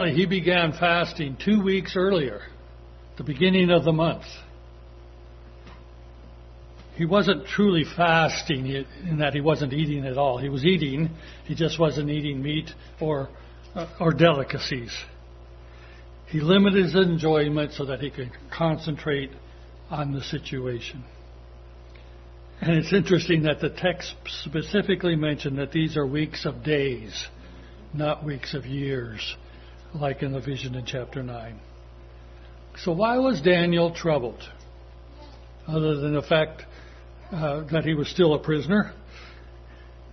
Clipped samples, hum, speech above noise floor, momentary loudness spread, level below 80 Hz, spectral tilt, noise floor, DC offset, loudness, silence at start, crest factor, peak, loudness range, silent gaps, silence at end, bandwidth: under 0.1%; 60 Hz at -45 dBFS; 21 dB; 17 LU; -46 dBFS; -6.5 dB/octave; -45 dBFS; under 0.1%; -24 LUFS; 0 s; 22 dB; -4 dBFS; 8 LU; none; 0 s; 6.4 kHz